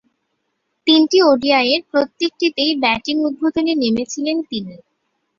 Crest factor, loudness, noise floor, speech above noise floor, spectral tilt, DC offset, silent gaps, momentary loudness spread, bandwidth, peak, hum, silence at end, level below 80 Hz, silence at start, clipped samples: 16 dB; -16 LUFS; -72 dBFS; 55 dB; -3.5 dB/octave; under 0.1%; none; 10 LU; 7.4 kHz; -2 dBFS; none; 0.6 s; -58 dBFS; 0.85 s; under 0.1%